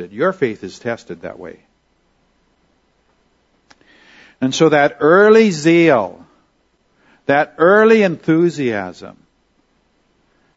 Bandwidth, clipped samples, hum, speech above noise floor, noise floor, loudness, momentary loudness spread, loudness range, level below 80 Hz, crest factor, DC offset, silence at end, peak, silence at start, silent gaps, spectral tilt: 8 kHz; under 0.1%; none; 47 dB; -61 dBFS; -14 LUFS; 19 LU; 15 LU; -62 dBFS; 16 dB; under 0.1%; 1.5 s; 0 dBFS; 0 s; none; -5.5 dB/octave